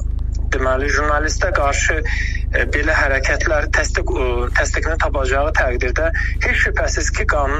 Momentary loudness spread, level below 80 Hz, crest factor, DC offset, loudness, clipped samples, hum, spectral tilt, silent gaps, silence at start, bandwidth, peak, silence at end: 4 LU; -20 dBFS; 16 dB; under 0.1%; -18 LUFS; under 0.1%; none; -4.5 dB/octave; none; 0 s; 8.8 kHz; -2 dBFS; 0 s